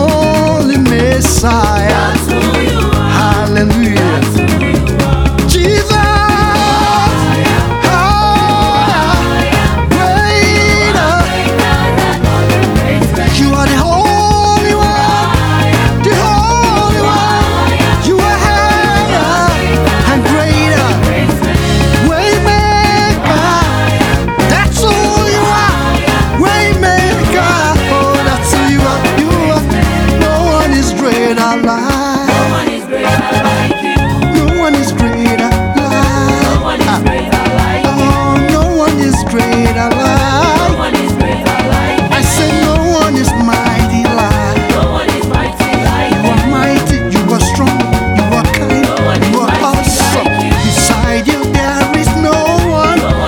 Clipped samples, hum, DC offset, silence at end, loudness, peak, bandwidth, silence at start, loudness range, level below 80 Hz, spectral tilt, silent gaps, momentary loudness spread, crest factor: under 0.1%; none; under 0.1%; 0 s; -10 LUFS; 0 dBFS; 19.5 kHz; 0 s; 2 LU; -20 dBFS; -5 dB/octave; none; 2 LU; 10 dB